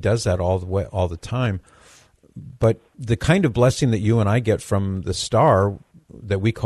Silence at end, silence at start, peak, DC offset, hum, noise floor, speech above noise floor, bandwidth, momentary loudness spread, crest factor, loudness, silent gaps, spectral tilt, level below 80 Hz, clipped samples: 0 s; 0 s; -2 dBFS; under 0.1%; none; -52 dBFS; 32 dB; 12.5 kHz; 9 LU; 20 dB; -21 LUFS; none; -6.5 dB/octave; -44 dBFS; under 0.1%